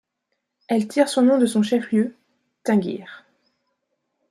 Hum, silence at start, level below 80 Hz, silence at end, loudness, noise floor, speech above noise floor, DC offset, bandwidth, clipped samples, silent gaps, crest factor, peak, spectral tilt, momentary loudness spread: none; 0.7 s; -72 dBFS; 1.1 s; -21 LUFS; -77 dBFS; 58 dB; under 0.1%; 13 kHz; under 0.1%; none; 18 dB; -4 dBFS; -5.5 dB/octave; 14 LU